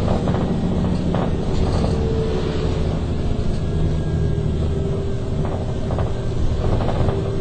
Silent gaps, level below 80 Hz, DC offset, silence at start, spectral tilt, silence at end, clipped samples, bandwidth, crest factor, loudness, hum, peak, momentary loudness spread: none; -24 dBFS; under 0.1%; 0 s; -8 dB/octave; 0 s; under 0.1%; 9 kHz; 14 dB; -22 LUFS; none; -6 dBFS; 3 LU